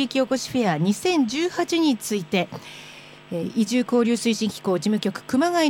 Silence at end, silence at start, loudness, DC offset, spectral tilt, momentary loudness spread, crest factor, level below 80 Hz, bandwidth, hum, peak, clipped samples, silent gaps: 0 s; 0 s; -23 LUFS; under 0.1%; -4.5 dB/octave; 12 LU; 14 dB; -62 dBFS; 17 kHz; none; -8 dBFS; under 0.1%; none